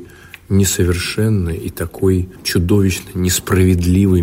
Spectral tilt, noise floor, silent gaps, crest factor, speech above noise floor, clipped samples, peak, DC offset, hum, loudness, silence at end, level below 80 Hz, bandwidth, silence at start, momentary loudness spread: -5.5 dB/octave; -38 dBFS; none; 14 dB; 23 dB; under 0.1%; -2 dBFS; under 0.1%; none; -16 LUFS; 0 s; -34 dBFS; 16.5 kHz; 0 s; 6 LU